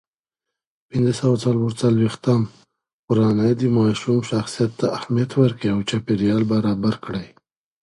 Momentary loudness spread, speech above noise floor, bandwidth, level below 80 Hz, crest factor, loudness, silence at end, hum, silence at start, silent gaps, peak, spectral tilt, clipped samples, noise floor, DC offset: 6 LU; 66 dB; 11.5 kHz; -52 dBFS; 18 dB; -20 LUFS; 0.55 s; none; 0.95 s; 2.93-3.08 s; -2 dBFS; -7 dB/octave; under 0.1%; -85 dBFS; under 0.1%